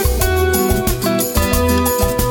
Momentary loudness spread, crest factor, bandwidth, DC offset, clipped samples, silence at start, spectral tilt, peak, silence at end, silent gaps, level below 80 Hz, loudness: 2 LU; 14 dB; 19.5 kHz; under 0.1%; under 0.1%; 0 s; -4.5 dB/octave; -2 dBFS; 0 s; none; -22 dBFS; -16 LUFS